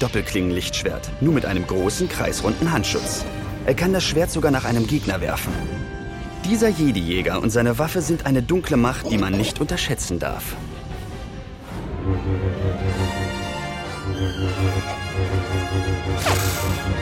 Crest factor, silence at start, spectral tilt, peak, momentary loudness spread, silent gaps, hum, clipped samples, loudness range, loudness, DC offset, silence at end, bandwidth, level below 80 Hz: 18 dB; 0 s; -5 dB/octave; -4 dBFS; 10 LU; none; none; under 0.1%; 5 LU; -22 LUFS; under 0.1%; 0 s; 16.5 kHz; -34 dBFS